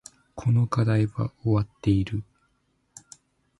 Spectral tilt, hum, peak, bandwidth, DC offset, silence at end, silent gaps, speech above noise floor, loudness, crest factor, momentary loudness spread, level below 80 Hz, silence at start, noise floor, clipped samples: -8 dB/octave; none; -10 dBFS; 11.5 kHz; under 0.1%; 1.4 s; none; 46 dB; -25 LUFS; 18 dB; 18 LU; -46 dBFS; 0.35 s; -70 dBFS; under 0.1%